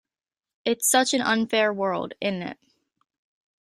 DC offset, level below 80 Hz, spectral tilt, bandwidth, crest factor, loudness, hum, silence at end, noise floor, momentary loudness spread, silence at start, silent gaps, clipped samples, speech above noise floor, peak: under 0.1%; -70 dBFS; -2.5 dB/octave; 15 kHz; 20 dB; -23 LUFS; none; 1.1 s; under -90 dBFS; 11 LU; 0.65 s; none; under 0.1%; over 66 dB; -8 dBFS